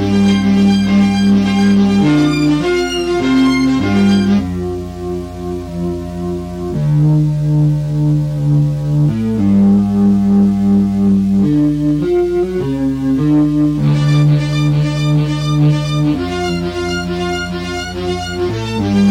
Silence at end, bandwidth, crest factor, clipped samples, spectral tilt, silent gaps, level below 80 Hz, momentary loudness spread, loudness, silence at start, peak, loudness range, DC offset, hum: 0 s; 11 kHz; 10 dB; under 0.1%; -7.5 dB/octave; none; -34 dBFS; 10 LU; -14 LUFS; 0 s; -2 dBFS; 5 LU; under 0.1%; none